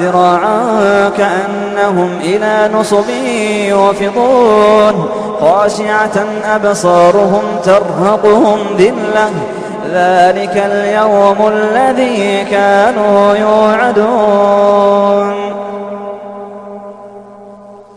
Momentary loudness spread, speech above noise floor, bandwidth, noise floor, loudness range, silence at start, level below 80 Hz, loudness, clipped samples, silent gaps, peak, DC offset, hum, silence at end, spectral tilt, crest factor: 11 LU; 24 dB; 11 kHz; -33 dBFS; 2 LU; 0 s; -48 dBFS; -10 LUFS; 0.1%; none; 0 dBFS; under 0.1%; none; 0.15 s; -5.5 dB/octave; 10 dB